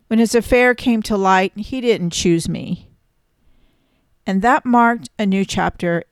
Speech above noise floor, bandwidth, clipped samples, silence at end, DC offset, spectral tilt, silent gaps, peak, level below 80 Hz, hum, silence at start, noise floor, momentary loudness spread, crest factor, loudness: 46 dB; 14 kHz; under 0.1%; 0.1 s; under 0.1%; -5 dB/octave; none; -4 dBFS; -42 dBFS; none; 0.1 s; -62 dBFS; 9 LU; 14 dB; -17 LUFS